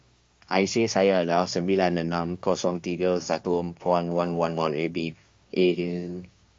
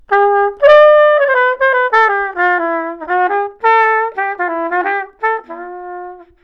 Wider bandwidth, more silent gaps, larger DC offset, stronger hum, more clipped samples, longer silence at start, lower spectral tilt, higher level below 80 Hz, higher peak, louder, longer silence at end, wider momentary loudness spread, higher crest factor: first, 7.6 kHz vs 6.2 kHz; neither; neither; neither; neither; first, 0.5 s vs 0.1 s; first, -5.5 dB/octave vs -4 dB/octave; second, -64 dBFS vs -52 dBFS; second, -6 dBFS vs 0 dBFS; second, -26 LUFS vs -12 LUFS; first, 0.35 s vs 0.2 s; second, 9 LU vs 20 LU; first, 18 dB vs 12 dB